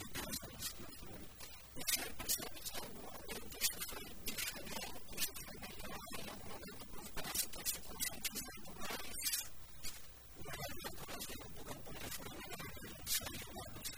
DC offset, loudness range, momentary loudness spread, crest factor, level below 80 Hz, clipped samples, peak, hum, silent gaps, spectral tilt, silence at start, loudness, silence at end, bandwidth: under 0.1%; 4 LU; 12 LU; 24 dB; -58 dBFS; under 0.1%; -20 dBFS; none; none; -1.5 dB/octave; 0 s; -43 LUFS; 0 s; over 20 kHz